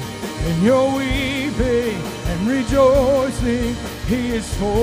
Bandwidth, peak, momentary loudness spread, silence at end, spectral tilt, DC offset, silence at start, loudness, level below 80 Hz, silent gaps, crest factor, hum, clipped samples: 16 kHz; -2 dBFS; 10 LU; 0 s; -5.5 dB/octave; under 0.1%; 0 s; -19 LUFS; -30 dBFS; none; 16 dB; none; under 0.1%